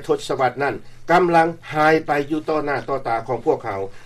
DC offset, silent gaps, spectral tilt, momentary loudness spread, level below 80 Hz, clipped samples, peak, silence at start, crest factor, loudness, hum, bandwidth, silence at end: under 0.1%; none; -6 dB/octave; 8 LU; -48 dBFS; under 0.1%; -4 dBFS; 0 s; 16 dB; -20 LUFS; none; 14 kHz; 0 s